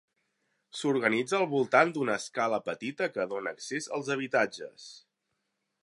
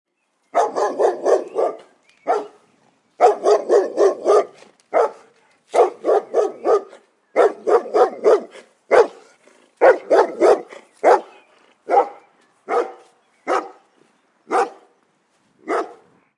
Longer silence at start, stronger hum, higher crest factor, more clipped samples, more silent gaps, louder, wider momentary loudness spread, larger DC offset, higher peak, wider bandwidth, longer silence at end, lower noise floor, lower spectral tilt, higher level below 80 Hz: first, 0.75 s vs 0.55 s; neither; first, 24 dB vs 18 dB; neither; neither; second, -29 LUFS vs -18 LUFS; first, 16 LU vs 9 LU; neither; second, -8 dBFS vs -2 dBFS; about the same, 11.5 kHz vs 11 kHz; first, 0.85 s vs 0.45 s; first, -81 dBFS vs -63 dBFS; about the same, -4.5 dB/octave vs -3.5 dB/octave; second, -80 dBFS vs -72 dBFS